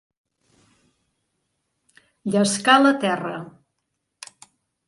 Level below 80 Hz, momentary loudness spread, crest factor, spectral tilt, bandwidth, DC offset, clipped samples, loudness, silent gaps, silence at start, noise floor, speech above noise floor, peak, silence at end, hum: -70 dBFS; 27 LU; 22 dB; -4 dB/octave; 11.5 kHz; under 0.1%; under 0.1%; -19 LUFS; none; 2.25 s; -77 dBFS; 58 dB; -2 dBFS; 1.4 s; none